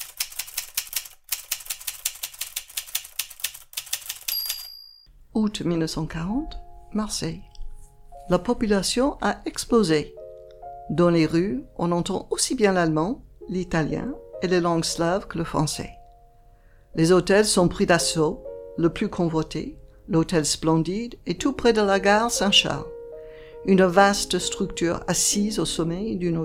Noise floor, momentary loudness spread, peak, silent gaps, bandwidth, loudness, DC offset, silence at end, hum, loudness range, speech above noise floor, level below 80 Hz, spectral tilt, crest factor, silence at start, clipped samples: -52 dBFS; 14 LU; -4 dBFS; none; 17 kHz; -23 LUFS; under 0.1%; 0 s; none; 8 LU; 30 dB; -44 dBFS; -4 dB/octave; 20 dB; 0 s; under 0.1%